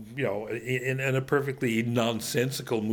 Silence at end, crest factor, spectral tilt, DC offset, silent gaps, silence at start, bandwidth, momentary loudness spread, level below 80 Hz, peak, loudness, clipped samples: 0 s; 18 dB; -5.5 dB/octave; under 0.1%; none; 0 s; over 20 kHz; 5 LU; -62 dBFS; -10 dBFS; -28 LUFS; under 0.1%